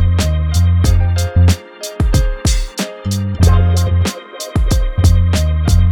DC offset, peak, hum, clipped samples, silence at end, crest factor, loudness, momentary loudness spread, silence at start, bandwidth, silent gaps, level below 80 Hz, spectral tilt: under 0.1%; -2 dBFS; none; under 0.1%; 0 s; 12 dB; -15 LUFS; 8 LU; 0 s; 16 kHz; none; -18 dBFS; -5.5 dB/octave